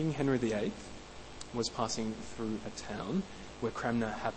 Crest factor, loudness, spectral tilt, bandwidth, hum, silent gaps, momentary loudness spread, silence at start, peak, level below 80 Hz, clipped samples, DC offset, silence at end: 18 dB; -36 LUFS; -5 dB/octave; 8.4 kHz; none; none; 15 LU; 0 s; -18 dBFS; -56 dBFS; under 0.1%; under 0.1%; 0 s